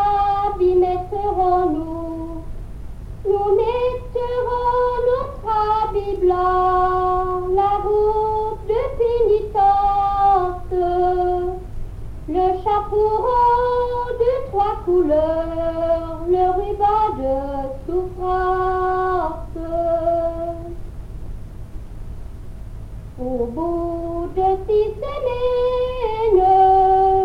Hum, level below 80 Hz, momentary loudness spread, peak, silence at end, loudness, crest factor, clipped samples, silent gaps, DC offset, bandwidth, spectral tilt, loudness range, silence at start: none; -34 dBFS; 19 LU; -6 dBFS; 0 s; -19 LUFS; 14 dB; under 0.1%; none; under 0.1%; 10 kHz; -8 dB/octave; 7 LU; 0 s